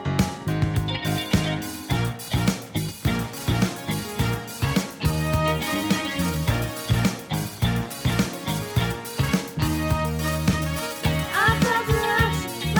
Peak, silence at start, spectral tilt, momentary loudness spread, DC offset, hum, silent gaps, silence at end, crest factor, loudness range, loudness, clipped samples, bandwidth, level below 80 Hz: -6 dBFS; 0 s; -5 dB/octave; 6 LU; under 0.1%; none; none; 0 s; 18 dB; 3 LU; -24 LUFS; under 0.1%; over 20 kHz; -36 dBFS